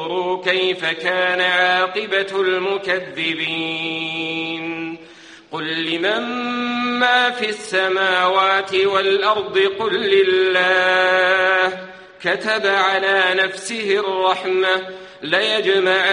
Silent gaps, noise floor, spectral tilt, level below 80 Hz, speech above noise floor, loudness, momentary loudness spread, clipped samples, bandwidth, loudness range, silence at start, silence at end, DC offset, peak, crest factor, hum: none; -42 dBFS; -3.5 dB/octave; -64 dBFS; 24 dB; -18 LUFS; 9 LU; under 0.1%; 10.5 kHz; 7 LU; 0 s; 0 s; under 0.1%; -2 dBFS; 16 dB; none